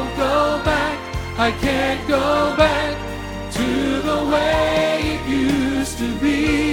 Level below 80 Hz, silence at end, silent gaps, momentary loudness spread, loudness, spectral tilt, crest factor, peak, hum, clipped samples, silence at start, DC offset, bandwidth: -34 dBFS; 0 s; none; 7 LU; -19 LUFS; -5 dB/octave; 18 dB; -2 dBFS; none; under 0.1%; 0 s; under 0.1%; 17 kHz